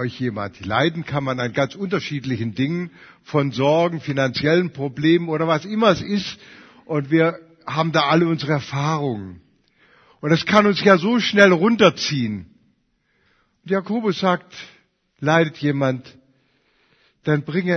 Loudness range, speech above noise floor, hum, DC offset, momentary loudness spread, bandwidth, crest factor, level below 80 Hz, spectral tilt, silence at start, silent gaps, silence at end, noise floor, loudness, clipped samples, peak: 6 LU; 47 dB; none; under 0.1%; 12 LU; 6.6 kHz; 20 dB; -58 dBFS; -6 dB/octave; 0 s; none; 0 s; -66 dBFS; -20 LUFS; under 0.1%; 0 dBFS